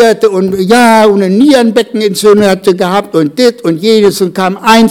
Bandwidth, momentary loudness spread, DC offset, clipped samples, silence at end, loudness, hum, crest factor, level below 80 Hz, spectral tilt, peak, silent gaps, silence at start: 18.5 kHz; 6 LU; 0.5%; 4%; 0 s; -8 LUFS; none; 8 dB; -46 dBFS; -5 dB/octave; 0 dBFS; none; 0 s